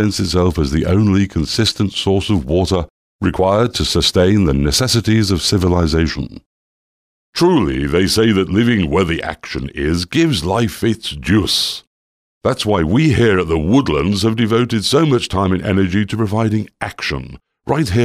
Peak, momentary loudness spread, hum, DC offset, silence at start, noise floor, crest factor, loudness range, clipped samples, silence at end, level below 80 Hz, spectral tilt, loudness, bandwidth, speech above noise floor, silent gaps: -2 dBFS; 8 LU; none; under 0.1%; 0 s; under -90 dBFS; 12 dB; 2 LU; under 0.1%; 0 s; -32 dBFS; -5.5 dB/octave; -15 LUFS; 16 kHz; over 75 dB; 2.90-3.19 s, 6.46-7.33 s, 11.87-12.41 s